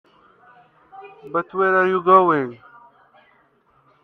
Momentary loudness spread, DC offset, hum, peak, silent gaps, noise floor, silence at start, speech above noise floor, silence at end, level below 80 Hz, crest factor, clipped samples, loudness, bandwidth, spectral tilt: 15 LU; under 0.1%; none; 0 dBFS; none; -59 dBFS; 0.95 s; 42 dB; 1.5 s; -68 dBFS; 22 dB; under 0.1%; -18 LUFS; 4.2 kHz; -8.5 dB/octave